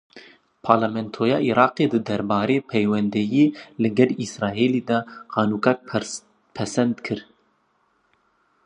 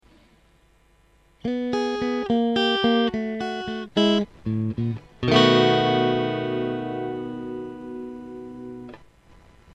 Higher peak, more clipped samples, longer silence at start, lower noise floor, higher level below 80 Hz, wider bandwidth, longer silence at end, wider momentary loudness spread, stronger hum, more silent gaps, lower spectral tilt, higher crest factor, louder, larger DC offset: first, 0 dBFS vs -4 dBFS; neither; second, 0.15 s vs 1.45 s; first, -66 dBFS vs -59 dBFS; second, -60 dBFS vs -54 dBFS; first, 10.5 kHz vs 8.4 kHz; first, 1.45 s vs 0.75 s; second, 10 LU vs 19 LU; neither; neither; about the same, -6 dB/octave vs -6 dB/octave; about the same, 22 dB vs 20 dB; about the same, -22 LUFS vs -23 LUFS; neither